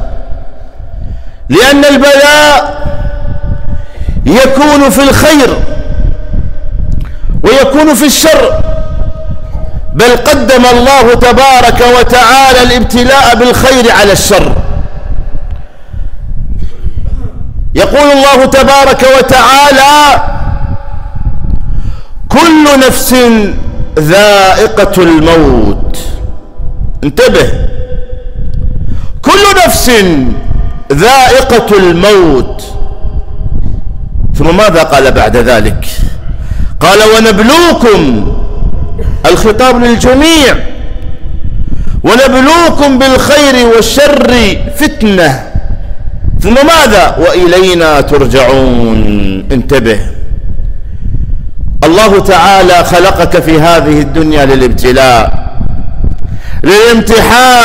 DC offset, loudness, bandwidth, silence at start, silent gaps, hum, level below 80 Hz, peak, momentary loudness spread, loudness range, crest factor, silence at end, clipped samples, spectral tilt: under 0.1%; -5 LUFS; 16.5 kHz; 0 s; none; none; -14 dBFS; 0 dBFS; 17 LU; 5 LU; 4 dB; 0 s; 0.5%; -4.5 dB/octave